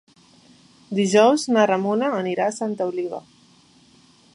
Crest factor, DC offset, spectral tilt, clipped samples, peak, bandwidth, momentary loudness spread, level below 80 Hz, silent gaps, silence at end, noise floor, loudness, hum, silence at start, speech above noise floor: 20 dB; under 0.1%; -5 dB/octave; under 0.1%; -4 dBFS; 11.5 kHz; 13 LU; -72 dBFS; none; 1.15 s; -54 dBFS; -21 LUFS; none; 0.9 s; 34 dB